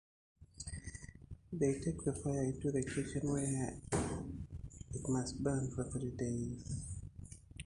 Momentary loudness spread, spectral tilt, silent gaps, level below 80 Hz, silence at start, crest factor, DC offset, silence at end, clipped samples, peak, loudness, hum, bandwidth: 14 LU; -6 dB/octave; none; -54 dBFS; 0.4 s; 18 dB; under 0.1%; 0.05 s; under 0.1%; -22 dBFS; -40 LUFS; none; 11.5 kHz